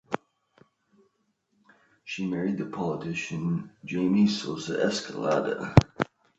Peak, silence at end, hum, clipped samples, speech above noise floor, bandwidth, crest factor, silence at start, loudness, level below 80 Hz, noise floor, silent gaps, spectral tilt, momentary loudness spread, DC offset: 0 dBFS; 0.35 s; none; under 0.1%; 47 dB; 8.2 kHz; 28 dB; 0.1 s; -28 LUFS; -46 dBFS; -73 dBFS; none; -6.5 dB/octave; 12 LU; under 0.1%